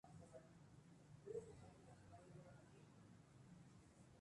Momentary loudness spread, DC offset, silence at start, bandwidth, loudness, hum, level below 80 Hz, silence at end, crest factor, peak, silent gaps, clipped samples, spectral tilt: 12 LU; under 0.1%; 0.05 s; 11 kHz; -63 LUFS; none; -80 dBFS; 0 s; 20 dB; -42 dBFS; none; under 0.1%; -6.5 dB/octave